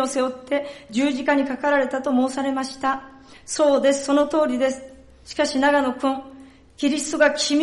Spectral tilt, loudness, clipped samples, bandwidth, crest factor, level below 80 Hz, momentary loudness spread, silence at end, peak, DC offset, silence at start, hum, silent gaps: -2.5 dB/octave; -21 LUFS; under 0.1%; 11.5 kHz; 16 dB; -56 dBFS; 8 LU; 0 s; -6 dBFS; under 0.1%; 0 s; none; none